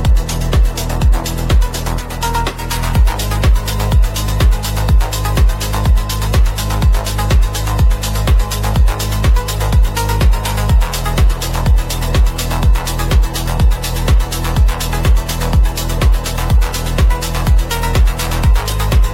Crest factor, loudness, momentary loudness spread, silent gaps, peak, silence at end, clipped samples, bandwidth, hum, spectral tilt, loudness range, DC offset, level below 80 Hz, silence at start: 10 dB; -15 LUFS; 3 LU; none; -2 dBFS; 0 s; under 0.1%; 16.5 kHz; none; -5 dB/octave; 1 LU; under 0.1%; -14 dBFS; 0 s